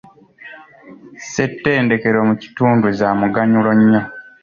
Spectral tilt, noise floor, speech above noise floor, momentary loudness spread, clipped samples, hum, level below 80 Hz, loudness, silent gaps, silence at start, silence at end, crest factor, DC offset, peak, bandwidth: -7 dB/octave; -41 dBFS; 26 dB; 12 LU; under 0.1%; none; -52 dBFS; -15 LUFS; none; 0.45 s; 0.2 s; 14 dB; under 0.1%; -2 dBFS; 7.4 kHz